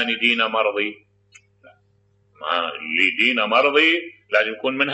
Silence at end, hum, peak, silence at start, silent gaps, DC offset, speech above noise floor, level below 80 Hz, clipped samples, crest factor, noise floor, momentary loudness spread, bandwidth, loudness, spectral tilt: 0 s; 50 Hz at -65 dBFS; -4 dBFS; 0 s; none; under 0.1%; 41 dB; -76 dBFS; under 0.1%; 18 dB; -62 dBFS; 8 LU; 8.4 kHz; -19 LUFS; -3.5 dB/octave